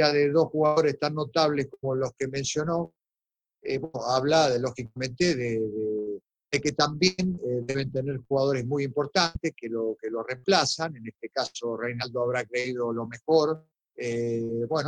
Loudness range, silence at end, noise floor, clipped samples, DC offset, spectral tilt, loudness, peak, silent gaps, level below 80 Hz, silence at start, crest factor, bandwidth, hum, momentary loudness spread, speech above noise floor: 2 LU; 0 s; under -90 dBFS; under 0.1%; under 0.1%; -4.5 dB/octave; -27 LUFS; -6 dBFS; none; -58 dBFS; 0 s; 20 dB; 9.6 kHz; none; 10 LU; over 63 dB